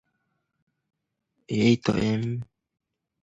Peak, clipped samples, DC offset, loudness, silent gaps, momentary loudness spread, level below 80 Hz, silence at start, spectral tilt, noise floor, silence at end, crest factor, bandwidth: -8 dBFS; under 0.1%; under 0.1%; -25 LUFS; none; 13 LU; -56 dBFS; 1.5 s; -6.5 dB/octave; -77 dBFS; 0.8 s; 22 dB; 8 kHz